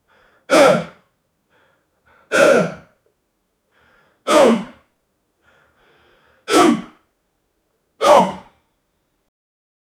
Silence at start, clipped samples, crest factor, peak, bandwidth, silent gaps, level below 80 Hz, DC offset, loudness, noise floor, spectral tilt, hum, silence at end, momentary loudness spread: 0.5 s; under 0.1%; 20 dB; 0 dBFS; 17 kHz; none; -60 dBFS; under 0.1%; -15 LUFS; -69 dBFS; -4 dB/octave; none; 1.6 s; 20 LU